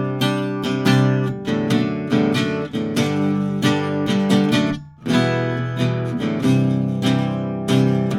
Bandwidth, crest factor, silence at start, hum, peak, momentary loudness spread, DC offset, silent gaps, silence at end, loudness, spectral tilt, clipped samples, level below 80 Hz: 15 kHz; 16 dB; 0 s; none; -4 dBFS; 6 LU; under 0.1%; none; 0 s; -20 LUFS; -6.5 dB/octave; under 0.1%; -54 dBFS